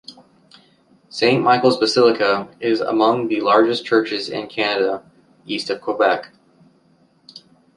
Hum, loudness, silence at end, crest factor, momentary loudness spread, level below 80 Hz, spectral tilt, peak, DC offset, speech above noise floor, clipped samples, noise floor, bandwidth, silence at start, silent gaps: none; -18 LUFS; 0.4 s; 18 dB; 10 LU; -66 dBFS; -5 dB/octave; -2 dBFS; under 0.1%; 39 dB; under 0.1%; -57 dBFS; 11.5 kHz; 0.1 s; none